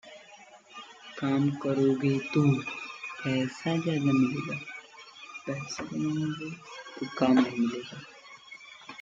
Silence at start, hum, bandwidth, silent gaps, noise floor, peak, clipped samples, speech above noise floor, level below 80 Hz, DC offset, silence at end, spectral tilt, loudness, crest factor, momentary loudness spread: 0.05 s; none; 7.8 kHz; none; -53 dBFS; -12 dBFS; under 0.1%; 25 dB; -72 dBFS; under 0.1%; 0 s; -6.5 dB/octave; -29 LUFS; 18 dB; 21 LU